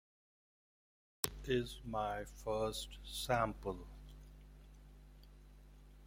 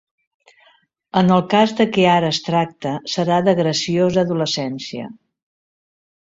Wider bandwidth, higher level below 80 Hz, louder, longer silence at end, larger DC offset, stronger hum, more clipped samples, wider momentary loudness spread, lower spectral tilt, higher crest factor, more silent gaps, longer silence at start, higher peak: first, 16.5 kHz vs 7.8 kHz; about the same, -56 dBFS vs -56 dBFS; second, -41 LUFS vs -18 LUFS; second, 0 s vs 1.1 s; neither; first, 50 Hz at -55 dBFS vs none; neither; first, 25 LU vs 11 LU; second, -4 dB/octave vs -5.5 dB/octave; first, 34 dB vs 18 dB; neither; about the same, 1.25 s vs 1.15 s; second, -10 dBFS vs -2 dBFS